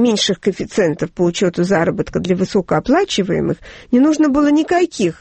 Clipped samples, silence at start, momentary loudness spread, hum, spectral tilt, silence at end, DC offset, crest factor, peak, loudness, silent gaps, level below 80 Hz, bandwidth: under 0.1%; 0 s; 6 LU; none; -5.5 dB/octave; 0.05 s; under 0.1%; 12 dB; -2 dBFS; -16 LUFS; none; -44 dBFS; 8.8 kHz